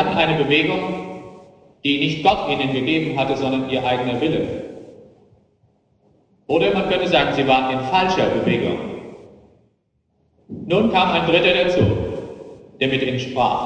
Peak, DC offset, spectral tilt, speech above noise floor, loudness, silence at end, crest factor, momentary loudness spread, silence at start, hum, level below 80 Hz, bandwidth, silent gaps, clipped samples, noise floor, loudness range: 0 dBFS; under 0.1%; -6 dB/octave; 48 dB; -19 LUFS; 0 s; 20 dB; 16 LU; 0 s; none; -46 dBFS; 9.4 kHz; none; under 0.1%; -66 dBFS; 5 LU